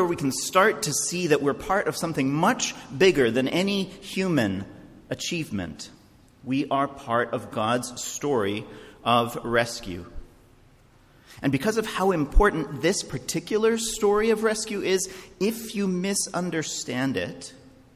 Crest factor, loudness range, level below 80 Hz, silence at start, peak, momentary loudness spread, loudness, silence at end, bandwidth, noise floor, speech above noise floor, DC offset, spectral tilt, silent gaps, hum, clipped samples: 18 dB; 5 LU; -38 dBFS; 0 s; -6 dBFS; 11 LU; -25 LUFS; 0.25 s; 15.5 kHz; -55 dBFS; 31 dB; under 0.1%; -4 dB/octave; none; none; under 0.1%